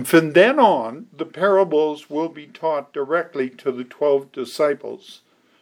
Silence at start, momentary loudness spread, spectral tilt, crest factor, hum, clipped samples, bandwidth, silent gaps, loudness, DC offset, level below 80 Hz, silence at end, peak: 0 s; 16 LU; -5.5 dB/octave; 18 dB; none; under 0.1%; over 20 kHz; none; -20 LUFS; under 0.1%; -82 dBFS; 0.5 s; -2 dBFS